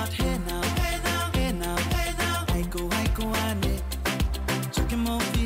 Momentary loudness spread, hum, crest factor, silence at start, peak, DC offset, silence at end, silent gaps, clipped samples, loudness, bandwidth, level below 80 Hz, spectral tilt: 2 LU; none; 10 dB; 0 s; -16 dBFS; under 0.1%; 0 s; none; under 0.1%; -27 LUFS; 16 kHz; -30 dBFS; -4.5 dB/octave